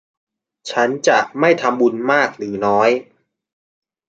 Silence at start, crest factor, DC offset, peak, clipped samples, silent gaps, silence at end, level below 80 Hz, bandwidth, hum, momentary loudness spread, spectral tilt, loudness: 0.65 s; 18 dB; under 0.1%; -2 dBFS; under 0.1%; none; 1.05 s; -64 dBFS; 9 kHz; none; 7 LU; -4.5 dB/octave; -17 LUFS